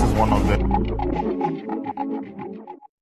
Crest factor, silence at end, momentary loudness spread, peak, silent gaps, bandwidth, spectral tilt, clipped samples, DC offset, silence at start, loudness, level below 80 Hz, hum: 16 dB; 0.15 s; 16 LU; -6 dBFS; none; 13.5 kHz; -7.5 dB/octave; under 0.1%; under 0.1%; 0 s; -23 LUFS; -28 dBFS; none